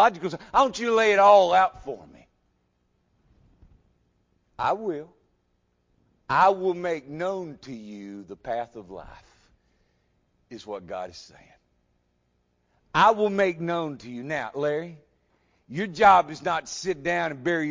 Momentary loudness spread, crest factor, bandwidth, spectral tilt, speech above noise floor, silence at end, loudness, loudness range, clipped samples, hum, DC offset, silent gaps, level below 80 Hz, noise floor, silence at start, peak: 22 LU; 22 dB; 7.6 kHz; -4.5 dB/octave; 47 dB; 0 s; -23 LUFS; 16 LU; under 0.1%; 60 Hz at -70 dBFS; under 0.1%; none; -60 dBFS; -71 dBFS; 0 s; -4 dBFS